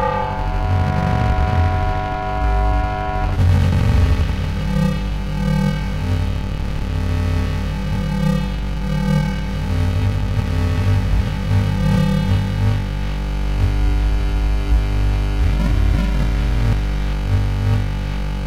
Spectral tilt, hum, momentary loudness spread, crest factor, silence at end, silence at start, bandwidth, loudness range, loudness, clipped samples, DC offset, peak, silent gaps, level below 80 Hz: -7.5 dB/octave; 50 Hz at -35 dBFS; 6 LU; 12 dB; 0 s; 0 s; 12 kHz; 2 LU; -20 LUFS; under 0.1%; 2%; -6 dBFS; none; -20 dBFS